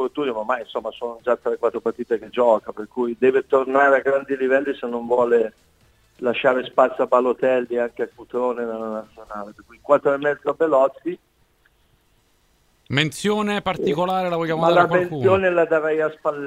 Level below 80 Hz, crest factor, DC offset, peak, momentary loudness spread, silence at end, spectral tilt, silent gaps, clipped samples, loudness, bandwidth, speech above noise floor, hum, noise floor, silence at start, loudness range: -60 dBFS; 20 dB; under 0.1%; -2 dBFS; 12 LU; 0 s; -6 dB/octave; none; under 0.1%; -21 LUFS; 13.5 kHz; 41 dB; none; -61 dBFS; 0 s; 4 LU